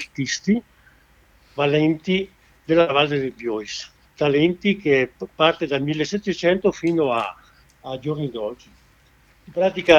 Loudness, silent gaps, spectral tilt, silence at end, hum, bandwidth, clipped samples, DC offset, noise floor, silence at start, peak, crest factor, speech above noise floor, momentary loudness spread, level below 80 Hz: -22 LUFS; none; -5.5 dB/octave; 0 s; none; 9.2 kHz; under 0.1%; under 0.1%; -56 dBFS; 0 s; 0 dBFS; 22 dB; 35 dB; 13 LU; -54 dBFS